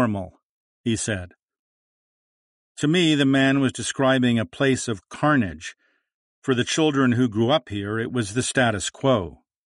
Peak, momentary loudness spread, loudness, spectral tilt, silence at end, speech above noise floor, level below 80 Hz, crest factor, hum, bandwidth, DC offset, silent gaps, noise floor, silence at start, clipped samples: -6 dBFS; 12 LU; -22 LUFS; -5 dB/octave; 0.3 s; over 68 dB; -54 dBFS; 16 dB; none; 11.5 kHz; under 0.1%; 0.43-0.84 s, 1.39-1.48 s, 1.59-2.75 s, 6.14-6.42 s; under -90 dBFS; 0 s; under 0.1%